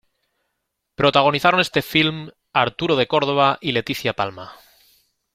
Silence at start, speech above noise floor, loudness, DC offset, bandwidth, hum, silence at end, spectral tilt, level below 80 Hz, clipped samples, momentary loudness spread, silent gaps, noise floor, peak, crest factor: 1 s; 57 dB; -19 LUFS; under 0.1%; 16.5 kHz; none; 0.8 s; -5 dB/octave; -56 dBFS; under 0.1%; 11 LU; none; -77 dBFS; 0 dBFS; 20 dB